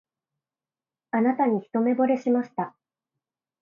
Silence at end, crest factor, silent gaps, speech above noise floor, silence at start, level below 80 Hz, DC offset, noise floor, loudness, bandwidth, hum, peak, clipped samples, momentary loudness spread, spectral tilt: 0.9 s; 16 dB; none; over 66 dB; 1.15 s; -78 dBFS; under 0.1%; under -90 dBFS; -24 LUFS; 7 kHz; none; -10 dBFS; under 0.1%; 10 LU; -9 dB/octave